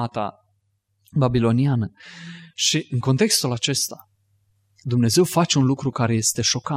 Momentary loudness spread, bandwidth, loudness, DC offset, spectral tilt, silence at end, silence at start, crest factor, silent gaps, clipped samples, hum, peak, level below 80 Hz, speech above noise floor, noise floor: 13 LU; 16 kHz; -21 LUFS; under 0.1%; -4.5 dB/octave; 0 s; 0 s; 18 dB; none; under 0.1%; none; -4 dBFS; -52 dBFS; 49 dB; -69 dBFS